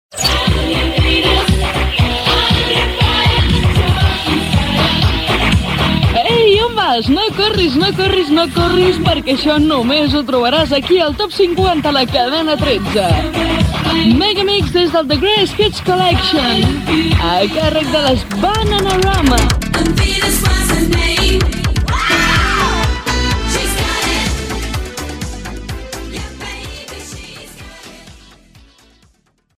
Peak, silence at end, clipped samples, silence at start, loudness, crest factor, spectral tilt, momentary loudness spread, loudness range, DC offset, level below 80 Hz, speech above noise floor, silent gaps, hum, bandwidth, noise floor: 0 dBFS; 1.4 s; under 0.1%; 0.1 s; -13 LUFS; 14 dB; -4.5 dB/octave; 12 LU; 8 LU; under 0.1%; -22 dBFS; 43 dB; none; none; 16.5 kHz; -56 dBFS